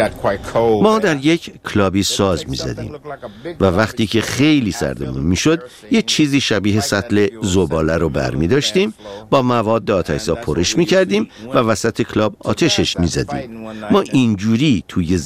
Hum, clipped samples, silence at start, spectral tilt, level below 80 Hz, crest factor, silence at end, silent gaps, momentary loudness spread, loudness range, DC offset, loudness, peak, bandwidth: none; under 0.1%; 0 s; -5 dB/octave; -38 dBFS; 16 dB; 0 s; none; 8 LU; 2 LU; 0.2%; -16 LUFS; 0 dBFS; 16 kHz